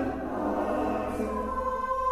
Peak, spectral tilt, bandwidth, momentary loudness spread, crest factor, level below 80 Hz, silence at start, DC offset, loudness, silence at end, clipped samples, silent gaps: -16 dBFS; -7 dB/octave; 15.5 kHz; 3 LU; 14 dB; -44 dBFS; 0 s; under 0.1%; -30 LUFS; 0 s; under 0.1%; none